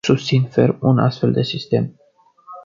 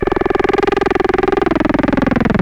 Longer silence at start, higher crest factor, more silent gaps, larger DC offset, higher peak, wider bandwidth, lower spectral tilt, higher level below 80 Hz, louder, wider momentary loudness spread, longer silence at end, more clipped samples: about the same, 0.05 s vs 0 s; about the same, 16 dB vs 12 dB; neither; neither; about the same, -2 dBFS vs -4 dBFS; second, 7.4 kHz vs 8.8 kHz; about the same, -7 dB/octave vs -7.5 dB/octave; second, -54 dBFS vs -30 dBFS; second, -18 LUFS vs -15 LUFS; first, 5 LU vs 0 LU; about the same, 0.05 s vs 0 s; neither